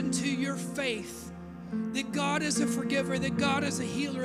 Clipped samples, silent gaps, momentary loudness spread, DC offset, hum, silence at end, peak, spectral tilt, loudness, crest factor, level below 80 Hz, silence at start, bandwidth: under 0.1%; none; 11 LU; under 0.1%; none; 0 s; -14 dBFS; -4 dB/octave; -30 LUFS; 18 dB; -60 dBFS; 0 s; 15.5 kHz